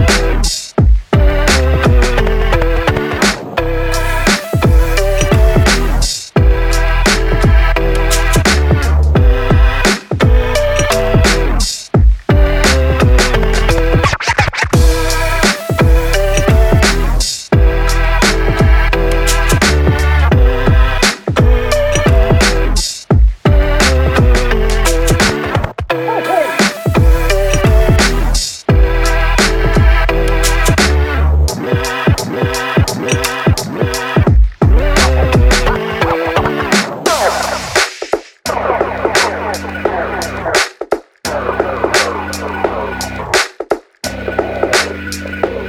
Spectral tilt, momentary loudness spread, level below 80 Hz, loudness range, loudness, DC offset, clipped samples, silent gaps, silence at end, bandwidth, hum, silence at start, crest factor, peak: -4.5 dB/octave; 7 LU; -14 dBFS; 4 LU; -13 LUFS; under 0.1%; under 0.1%; none; 0 s; 17.5 kHz; none; 0 s; 10 dB; 0 dBFS